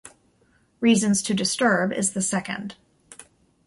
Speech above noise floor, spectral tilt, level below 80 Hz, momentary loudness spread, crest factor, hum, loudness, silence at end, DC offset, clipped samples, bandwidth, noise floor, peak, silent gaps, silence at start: 40 dB; -3.5 dB/octave; -62 dBFS; 12 LU; 18 dB; none; -22 LUFS; 0.45 s; under 0.1%; under 0.1%; 11.5 kHz; -63 dBFS; -6 dBFS; none; 0.05 s